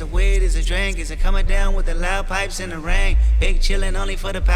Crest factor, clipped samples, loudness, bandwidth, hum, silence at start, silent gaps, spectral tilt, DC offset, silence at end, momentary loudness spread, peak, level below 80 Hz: 12 dB; under 0.1%; -22 LUFS; 11.5 kHz; none; 0 s; none; -4.5 dB/octave; under 0.1%; 0 s; 6 LU; -4 dBFS; -16 dBFS